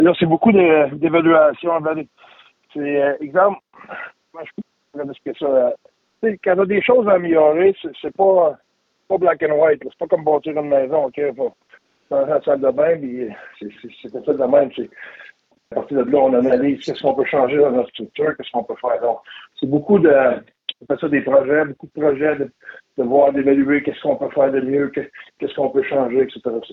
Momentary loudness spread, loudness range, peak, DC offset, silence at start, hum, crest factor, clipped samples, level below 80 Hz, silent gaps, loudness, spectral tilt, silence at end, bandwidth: 18 LU; 5 LU; -2 dBFS; under 0.1%; 0 s; none; 14 dB; under 0.1%; -60 dBFS; none; -17 LUFS; -8.5 dB/octave; 0 s; 6 kHz